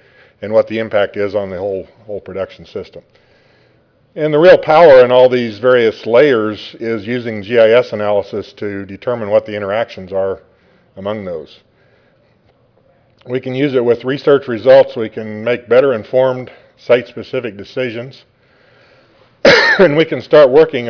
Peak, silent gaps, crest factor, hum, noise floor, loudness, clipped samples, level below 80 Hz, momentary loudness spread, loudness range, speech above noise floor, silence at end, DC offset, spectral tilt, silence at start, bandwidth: 0 dBFS; none; 14 dB; none; -53 dBFS; -13 LUFS; under 0.1%; -52 dBFS; 17 LU; 13 LU; 41 dB; 0 s; under 0.1%; -6 dB/octave; 0.4 s; 5.4 kHz